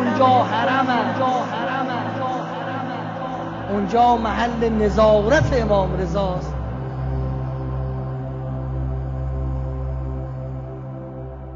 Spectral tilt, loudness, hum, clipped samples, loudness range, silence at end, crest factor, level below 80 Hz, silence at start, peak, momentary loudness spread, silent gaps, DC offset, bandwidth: -7 dB/octave; -21 LUFS; none; under 0.1%; 8 LU; 0 s; 16 dB; -32 dBFS; 0 s; -4 dBFS; 13 LU; none; under 0.1%; 7.6 kHz